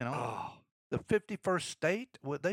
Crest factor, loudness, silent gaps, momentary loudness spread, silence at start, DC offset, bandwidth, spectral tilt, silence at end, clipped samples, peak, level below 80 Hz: 18 dB; -35 LUFS; 0.72-0.90 s; 8 LU; 0 s; under 0.1%; 16 kHz; -5 dB/octave; 0 s; under 0.1%; -18 dBFS; -68 dBFS